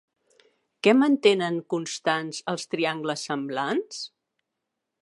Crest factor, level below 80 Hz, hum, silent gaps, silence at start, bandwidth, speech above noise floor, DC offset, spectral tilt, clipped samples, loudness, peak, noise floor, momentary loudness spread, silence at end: 22 dB; -82 dBFS; none; none; 0.85 s; 11.5 kHz; 58 dB; under 0.1%; -4.5 dB/octave; under 0.1%; -25 LUFS; -4 dBFS; -83 dBFS; 11 LU; 0.95 s